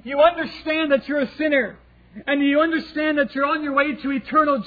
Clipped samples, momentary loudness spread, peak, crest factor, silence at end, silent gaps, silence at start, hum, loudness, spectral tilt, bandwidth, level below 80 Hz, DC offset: under 0.1%; 7 LU; -4 dBFS; 16 dB; 0 s; none; 0.05 s; none; -21 LUFS; -7 dB/octave; 5 kHz; -54 dBFS; under 0.1%